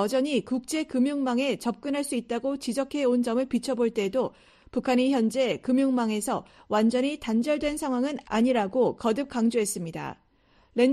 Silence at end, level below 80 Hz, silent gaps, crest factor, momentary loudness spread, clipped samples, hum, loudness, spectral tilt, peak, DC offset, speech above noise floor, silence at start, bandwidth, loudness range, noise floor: 0 s; -60 dBFS; none; 16 dB; 6 LU; under 0.1%; none; -27 LUFS; -4.5 dB/octave; -10 dBFS; under 0.1%; 36 dB; 0 s; 13 kHz; 2 LU; -62 dBFS